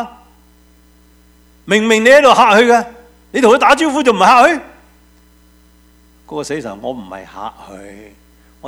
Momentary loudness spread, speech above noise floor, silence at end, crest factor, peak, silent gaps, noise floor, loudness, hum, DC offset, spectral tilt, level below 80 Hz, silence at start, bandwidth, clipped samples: 22 LU; 36 dB; 0 s; 14 dB; 0 dBFS; none; -48 dBFS; -10 LUFS; none; under 0.1%; -3.5 dB/octave; -48 dBFS; 0 s; 16.5 kHz; 0.3%